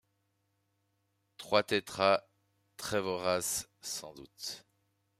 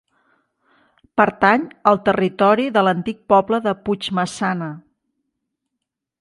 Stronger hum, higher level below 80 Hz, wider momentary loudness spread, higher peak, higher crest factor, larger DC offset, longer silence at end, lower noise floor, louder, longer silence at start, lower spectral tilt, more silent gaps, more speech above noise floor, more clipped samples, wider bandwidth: neither; second, -72 dBFS vs -58 dBFS; first, 14 LU vs 9 LU; second, -12 dBFS vs 0 dBFS; about the same, 24 dB vs 20 dB; neither; second, 0.6 s vs 1.4 s; about the same, -78 dBFS vs -81 dBFS; second, -33 LUFS vs -18 LUFS; first, 1.4 s vs 1.15 s; second, -2.5 dB/octave vs -6 dB/octave; neither; second, 46 dB vs 63 dB; neither; first, 15.5 kHz vs 11.5 kHz